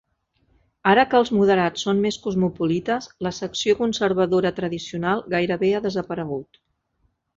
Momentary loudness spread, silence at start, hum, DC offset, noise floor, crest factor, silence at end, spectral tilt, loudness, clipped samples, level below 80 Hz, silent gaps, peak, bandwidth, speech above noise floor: 10 LU; 0.85 s; none; under 0.1%; -69 dBFS; 20 dB; 0.95 s; -5.5 dB/octave; -22 LUFS; under 0.1%; -56 dBFS; none; -4 dBFS; 7.8 kHz; 48 dB